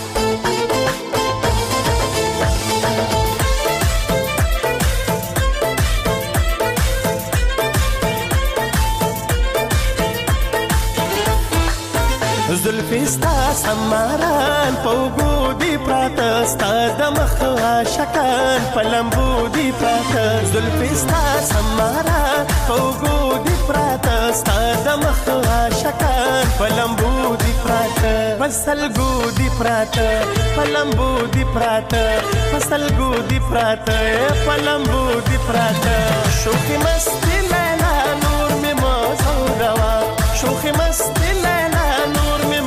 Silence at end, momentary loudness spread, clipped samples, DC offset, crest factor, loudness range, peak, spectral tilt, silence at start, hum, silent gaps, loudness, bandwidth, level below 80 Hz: 0 s; 2 LU; under 0.1%; under 0.1%; 10 dB; 2 LU; -6 dBFS; -4.5 dB/octave; 0 s; none; none; -17 LUFS; 16 kHz; -24 dBFS